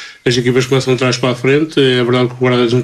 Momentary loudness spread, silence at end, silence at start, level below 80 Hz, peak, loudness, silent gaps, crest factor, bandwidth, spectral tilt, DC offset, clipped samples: 3 LU; 0 s; 0 s; -50 dBFS; 0 dBFS; -13 LUFS; none; 12 dB; 13 kHz; -5.5 dB/octave; under 0.1%; under 0.1%